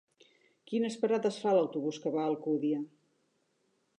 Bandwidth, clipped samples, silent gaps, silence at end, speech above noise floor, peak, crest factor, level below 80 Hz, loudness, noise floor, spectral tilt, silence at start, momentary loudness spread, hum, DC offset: 10.5 kHz; under 0.1%; none; 1.15 s; 45 dB; -16 dBFS; 18 dB; -90 dBFS; -32 LUFS; -76 dBFS; -6 dB/octave; 0.7 s; 7 LU; none; under 0.1%